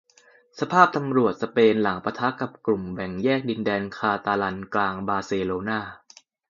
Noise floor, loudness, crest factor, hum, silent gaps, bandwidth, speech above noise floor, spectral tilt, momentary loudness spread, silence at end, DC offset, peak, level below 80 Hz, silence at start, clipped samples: -57 dBFS; -24 LUFS; 24 dB; none; none; 7.4 kHz; 33 dB; -6.5 dB/octave; 9 LU; 0.5 s; under 0.1%; 0 dBFS; -58 dBFS; 0.55 s; under 0.1%